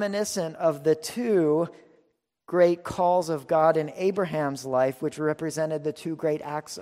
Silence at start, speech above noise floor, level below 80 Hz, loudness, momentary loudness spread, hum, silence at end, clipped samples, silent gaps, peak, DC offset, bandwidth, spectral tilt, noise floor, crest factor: 0 s; 43 dB; -64 dBFS; -26 LUFS; 7 LU; none; 0 s; under 0.1%; none; -8 dBFS; under 0.1%; 16 kHz; -5.5 dB/octave; -68 dBFS; 18 dB